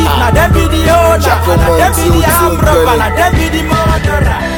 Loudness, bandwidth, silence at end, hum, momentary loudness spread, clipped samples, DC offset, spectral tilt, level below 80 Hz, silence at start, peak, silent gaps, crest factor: -9 LUFS; 17.5 kHz; 0 s; none; 3 LU; under 0.1%; under 0.1%; -5 dB/octave; -16 dBFS; 0 s; 0 dBFS; none; 8 dB